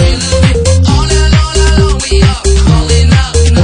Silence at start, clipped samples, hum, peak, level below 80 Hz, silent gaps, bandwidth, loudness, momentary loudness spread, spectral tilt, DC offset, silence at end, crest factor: 0 s; 0.6%; none; 0 dBFS; -12 dBFS; none; 10.5 kHz; -8 LUFS; 2 LU; -5 dB/octave; under 0.1%; 0 s; 6 dB